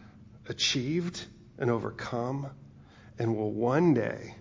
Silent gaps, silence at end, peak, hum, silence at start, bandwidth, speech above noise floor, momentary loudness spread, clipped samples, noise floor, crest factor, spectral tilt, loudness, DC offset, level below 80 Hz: none; 0 s; -14 dBFS; none; 0 s; 7.6 kHz; 23 dB; 17 LU; under 0.1%; -53 dBFS; 18 dB; -5 dB/octave; -30 LUFS; under 0.1%; -60 dBFS